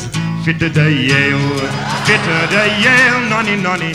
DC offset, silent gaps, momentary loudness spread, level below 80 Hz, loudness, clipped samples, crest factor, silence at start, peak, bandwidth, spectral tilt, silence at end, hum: under 0.1%; none; 8 LU; -42 dBFS; -12 LUFS; under 0.1%; 14 dB; 0 s; 0 dBFS; 15 kHz; -5 dB/octave; 0 s; none